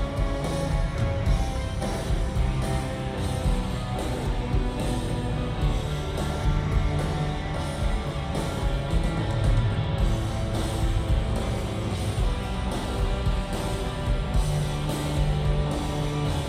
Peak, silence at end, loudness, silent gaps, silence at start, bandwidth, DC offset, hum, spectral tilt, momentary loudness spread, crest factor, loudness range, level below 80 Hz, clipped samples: -12 dBFS; 0 s; -28 LUFS; none; 0 s; 15 kHz; under 0.1%; none; -6 dB/octave; 4 LU; 14 dB; 2 LU; -28 dBFS; under 0.1%